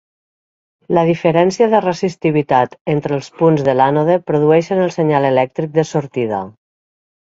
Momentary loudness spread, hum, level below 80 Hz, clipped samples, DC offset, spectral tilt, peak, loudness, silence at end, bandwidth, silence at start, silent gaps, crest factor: 7 LU; none; -56 dBFS; under 0.1%; under 0.1%; -7 dB/octave; 0 dBFS; -15 LUFS; 0.75 s; 8 kHz; 0.9 s; 2.81-2.85 s; 16 dB